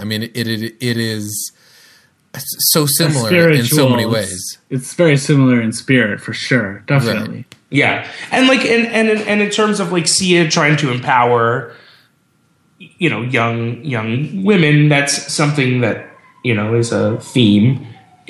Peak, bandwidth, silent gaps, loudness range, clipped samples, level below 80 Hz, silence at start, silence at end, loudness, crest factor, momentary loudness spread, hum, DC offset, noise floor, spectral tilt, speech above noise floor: 0 dBFS; 16 kHz; none; 4 LU; under 0.1%; -54 dBFS; 0 s; 0.35 s; -14 LUFS; 16 dB; 11 LU; none; under 0.1%; -58 dBFS; -4.5 dB/octave; 43 dB